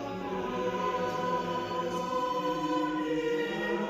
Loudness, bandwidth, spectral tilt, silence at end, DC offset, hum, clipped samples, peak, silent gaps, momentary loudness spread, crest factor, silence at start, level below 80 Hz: -31 LUFS; 15 kHz; -5.5 dB/octave; 0 s; under 0.1%; none; under 0.1%; -20 dBFS; none; 2 LU; 12 dB; 0 s; -60 dBFS